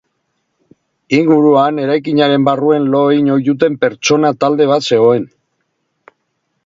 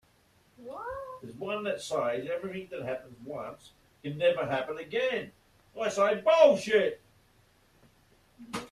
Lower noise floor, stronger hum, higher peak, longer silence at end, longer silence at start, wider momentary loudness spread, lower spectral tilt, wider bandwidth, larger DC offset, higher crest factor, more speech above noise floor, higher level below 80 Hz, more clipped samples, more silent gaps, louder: about the same, -68 dBFS vs -65 dBFS; neither; first, 0 dBFS vs -8 dBFS; first, 1.4 s vs 0.05 s; first, 1.1 s vs 0.6 s; second, 5 LU vs 21 LU; about the same, -5.5 dB/octave vs -4.5 dB/octave; second, 7.6 kHz vs 13.5 kHz; neither; second, 14 dB vs 24 dB; first, 56 dB vs 36 dB; first, -60 dBFS vs -68 dBFS; neither; neither; first, -12 LUFS vs -29 LUFS